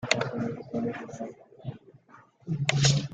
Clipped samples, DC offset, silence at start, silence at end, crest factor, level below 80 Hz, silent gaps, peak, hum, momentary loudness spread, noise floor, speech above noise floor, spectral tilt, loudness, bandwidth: under 0.1%; under 0.1%; 0 s; 0 s; 26 dB; -58 dBFS; none; -4 dBFS; none; 19 LU; -57 dBFS; 29 dB; -4.5 dB/octave; -29 LUFS; 9.4 kHz